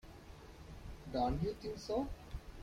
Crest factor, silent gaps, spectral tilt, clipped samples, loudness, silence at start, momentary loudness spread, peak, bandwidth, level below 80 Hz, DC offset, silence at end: 16 dB; none; -7 dB/octave; under 0.1%; -40 LUFS; 0.05 s; 19 LU; -24 dBFS; 16 kHz; -50 dBFS; under 0.1%; 0 s